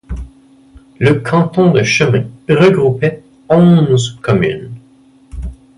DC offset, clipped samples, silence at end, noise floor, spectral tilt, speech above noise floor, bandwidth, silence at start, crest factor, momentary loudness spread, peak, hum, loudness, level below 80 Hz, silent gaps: under 0.1%; under 0.1%; 0.25 s; -46 dBFS; -6.5 dB/octave; 35 dB; 11 kHz; 0.1 s; 12 dB; 20 LU; 0 dBFS; none; -12 LUFS; -34 dBFS; none